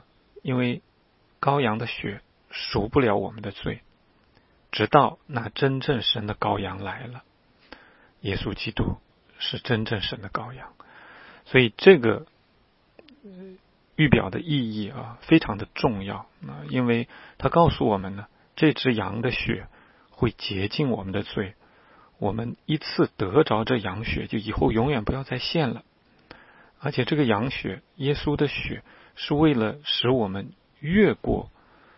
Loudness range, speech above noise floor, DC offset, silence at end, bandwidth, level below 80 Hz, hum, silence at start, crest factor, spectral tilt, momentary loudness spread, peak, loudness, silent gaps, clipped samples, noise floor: 6 LU; 38 dB; under 0.1%; 0.5 s; 5.8 kHz; -46 dBFS; none; 0.35 s; 26 dB; -10 dB/octave; 16 LU; 0 dBFS; -25 LUFS; none; under 0.1%; -63 dBFS